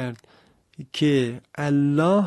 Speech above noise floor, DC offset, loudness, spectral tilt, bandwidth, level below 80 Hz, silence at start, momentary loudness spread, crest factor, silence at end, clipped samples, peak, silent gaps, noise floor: 36 dB; under 0.1%; -23 LUFS; -7 dB/octave; 12 kHz; -62 dBFS; 0 s; 19 LU; 14 dB; 0 s; under 0.1%; -8 dBFS; none; -58 dBFS